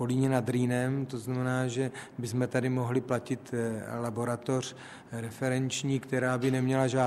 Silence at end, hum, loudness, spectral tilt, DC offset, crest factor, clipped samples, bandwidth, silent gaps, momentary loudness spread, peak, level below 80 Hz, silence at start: 0 s; none; -31 LUFS; -6 dB/octave; under 0.1%; 18 dB; under 0.1%; 14 kHz; none; 7 LU; -12 dBFS; -66 dBFS; 0 s